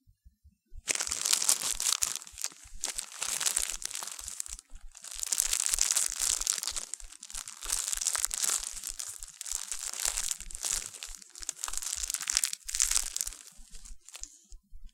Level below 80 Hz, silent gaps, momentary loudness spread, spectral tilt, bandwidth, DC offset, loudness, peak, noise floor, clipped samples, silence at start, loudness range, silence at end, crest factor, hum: -50 dBFS; none; 16 LU; 2 dB/octave; 17 kHz; under 0.1%; -30 LUFS; 0 dBFS; -61 dBFS; under 0.1%; 0.45 s; 4 LU; 0.05 s; 34 dB; none